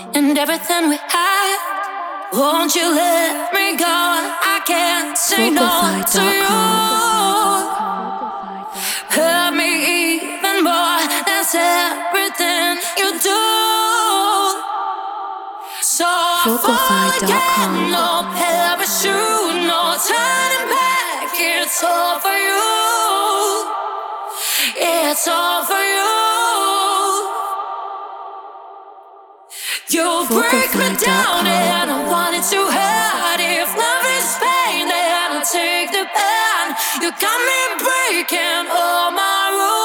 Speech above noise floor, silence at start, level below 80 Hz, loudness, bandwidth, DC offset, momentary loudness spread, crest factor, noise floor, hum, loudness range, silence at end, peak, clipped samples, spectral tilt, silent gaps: 26 dB; 0 s; -60 dBFS; -16 LUFS; over 20 kHz; under 0.1%; 8 LU; 16 dB; -42 dBFS; none; 2 LU; 0 s; -2 dBFS; under 0.1%; -1.5 dB/octave; none